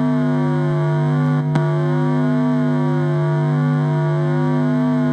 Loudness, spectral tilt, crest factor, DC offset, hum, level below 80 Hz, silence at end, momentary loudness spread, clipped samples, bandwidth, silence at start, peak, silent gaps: -18 LUFS; -9.5 dB/octave; 14 dB; under 0.1%; none; -60 dBFS; 0 s; 1 LU; under 0.1%; 5.4 kHz; 0 s; -2 dBFS; none